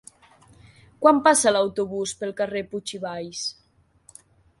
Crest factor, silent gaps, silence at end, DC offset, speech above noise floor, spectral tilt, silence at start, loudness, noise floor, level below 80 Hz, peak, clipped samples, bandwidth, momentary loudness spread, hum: 22 dB; none; 1.1 s; under 0.1%; 40 dB; -3 dB/octave; 1 s; -23 LUFS; -62 dBFS; -62 dBFS; -2 dBFS; under 0.1%; 11.5 kHz; 15 LU; none